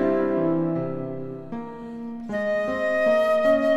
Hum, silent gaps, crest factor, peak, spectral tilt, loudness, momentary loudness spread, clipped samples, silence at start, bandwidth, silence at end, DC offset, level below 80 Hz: none; none; 12 dB; -10 dBFS; -7.5 dB/octave; -24 LUFS; 15 LU; under 0.1%; 0 s; 12 kHz; 0 s; under 0.1%; -56 dBFS